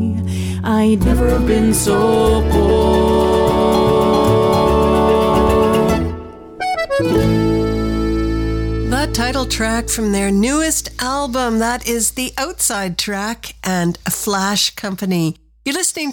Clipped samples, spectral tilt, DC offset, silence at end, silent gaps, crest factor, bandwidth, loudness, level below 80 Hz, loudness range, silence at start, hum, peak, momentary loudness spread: under 0.1%; -4.5 dB/octave; under 0.1%; 0 s; none; 12 dB; 18.5 kHz; -16 LUFS; -26 dBFS; 5 LU; 0 s; none; -4 dBFS; 8 LU